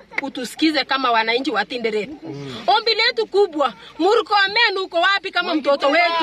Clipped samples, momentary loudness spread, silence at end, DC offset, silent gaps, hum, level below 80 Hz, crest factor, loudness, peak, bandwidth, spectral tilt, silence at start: under 0.1%; 10 LU; 0 s; under 0.1%; none; none; -64 dBFS; 12 dB; -18 LUFS; -6 dBFS; 14.5 kHz; -3.5 dB/octave; 0.1 s